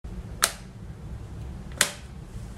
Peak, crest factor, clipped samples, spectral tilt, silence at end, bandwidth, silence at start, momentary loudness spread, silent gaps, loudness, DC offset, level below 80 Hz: 0 dBFS; 32 dB; under 0.1%; -1.5 dB/octave; 0 s; 16 kHz; 0.05 s; 16 LU; none; -27 LUFS; under 0.1%; -42 dBFS